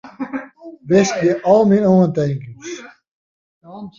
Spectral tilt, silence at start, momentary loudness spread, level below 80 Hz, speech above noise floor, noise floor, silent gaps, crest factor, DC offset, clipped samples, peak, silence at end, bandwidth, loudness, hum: -6.5 dB/octave; 0.05 s; 20 LU; -56 dBFS; 22 dB; -37 dBFS; 3.08-3.61 s; 16 dB; under 0.1%; under 0.1%; -2 dBFS; 0.1 s; 7.4 kHz; -15 LUFS; none